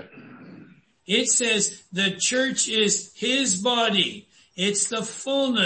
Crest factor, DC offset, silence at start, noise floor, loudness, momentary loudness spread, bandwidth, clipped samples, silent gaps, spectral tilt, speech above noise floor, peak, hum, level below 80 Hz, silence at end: 16 dB; under 0.1%; 0 s; -51 dBFS; -22 LUFS; 7 LU; 8.8 kHz; under 0.1%; none; -2 dB/octave; 27 dB; -8 dBFS; none; -68 dBFS; 0 s